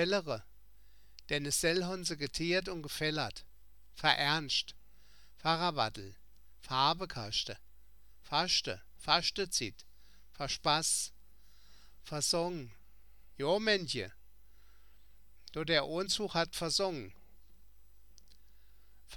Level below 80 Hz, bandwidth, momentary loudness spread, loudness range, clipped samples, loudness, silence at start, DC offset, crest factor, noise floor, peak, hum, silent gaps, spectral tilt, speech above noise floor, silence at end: -60 dBFS; 19 kHz; 13 LU; 3 LU; under 0.1%; -33 LUFS; 0 s; 0.2%; 26 dB; -64 dBFS; -10 dBFS; none; none; -2.5 dB/octave; 30 dB; 0 s